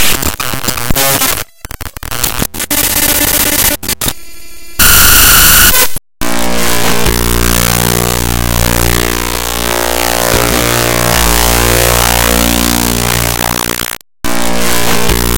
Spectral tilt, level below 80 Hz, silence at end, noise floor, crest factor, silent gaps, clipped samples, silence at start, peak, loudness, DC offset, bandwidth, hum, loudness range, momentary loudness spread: -2.5 dB/octave; -20 dBFS; 0 s; -33 dBFS; 10 dB; none; 1%; 0 s; 0 dBFS; -9 LUFS; under 0.1%; over 20 kHz; none; 5 LU; 12 LU